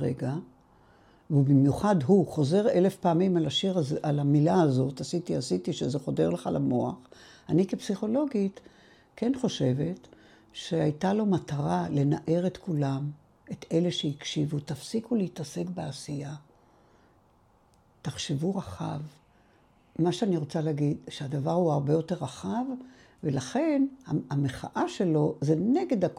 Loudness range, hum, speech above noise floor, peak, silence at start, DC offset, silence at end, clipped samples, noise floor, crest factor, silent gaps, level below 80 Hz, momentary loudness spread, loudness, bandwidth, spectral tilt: 11 LU; none; 36 dB; -10 dBFS; 0 s; under 0.1%; 0 s; under 0.1%; -63 dBFS; 18 dB; none; -62 dBFS; 12 LU; -28 LUFS; 12 kHz; -7 dB/octave